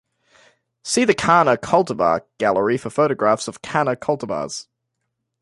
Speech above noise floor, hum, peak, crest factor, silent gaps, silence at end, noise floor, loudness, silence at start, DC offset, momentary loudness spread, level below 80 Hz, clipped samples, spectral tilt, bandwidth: 58 dB; none; -2 dBFS; 20 dB; none; 0.8 s; -77 dBFS; -19 LUFS; 0.85 s; under 0.1%; 11 LU; -56 dBFS; under 0.1%; -4.5 dB/octave; 11.5 kHz